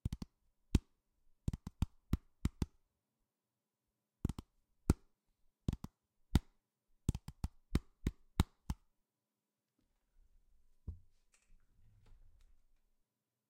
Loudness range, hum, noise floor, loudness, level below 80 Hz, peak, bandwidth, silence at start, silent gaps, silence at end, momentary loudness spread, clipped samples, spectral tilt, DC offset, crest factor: 20 LU; none; under -90 dBFS; -43 LUFS; -48 dBFS; -14 dBFS; 16 kHz; 0.05 s; none; 2.55 s; 15 LU; under 0.1%; -6.5 dB/octave; under 0.1%; 30 dB